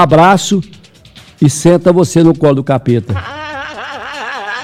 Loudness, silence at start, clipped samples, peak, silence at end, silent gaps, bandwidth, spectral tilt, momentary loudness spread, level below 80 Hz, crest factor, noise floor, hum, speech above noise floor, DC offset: -11 LUFS; 0 s; 0.5%; 0 dBFS; 0 s; none; 14.5 kHz; -6 dB/octave; 15 LU; -42 dBFS; 12 dB; -39 dBFS; none; 30 dB; under 0.1%